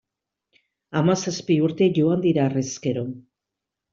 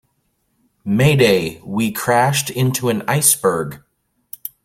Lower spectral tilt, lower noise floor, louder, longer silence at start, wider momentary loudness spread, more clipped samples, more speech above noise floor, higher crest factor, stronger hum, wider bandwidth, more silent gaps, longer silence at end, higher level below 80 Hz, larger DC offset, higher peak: first, -6 dB/octave vs -4.5 dB/octave; first, -85 dBFS vs -67 dBFS; second, -22 LUFS vs -16 LUFS; about the same, 0.9 s vs 0.85 s; second, 10 LU vs 18 LU; neither; first, 64 dB vs 50 dB; about the same, 16 dB vs 18 dB; neither; second, 7.6 kHz vs 16.5 kHz; neither; first, 0.7 s vs 0.15 s; second, -62 dBFS vs -50 dBFS; neither; second, -8 dBFS vs 0 dBFS